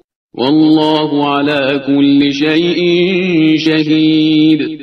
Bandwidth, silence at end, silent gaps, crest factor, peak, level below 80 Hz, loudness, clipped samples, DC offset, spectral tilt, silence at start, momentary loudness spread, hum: 6.4 kHz; 0 s; none; 10 dB; 0 dBFS; -54 dBFS; -11 LUFS; under 0.1%; under 0.1%; -6.5 dB/octave; 0.35 s; 3 LU; none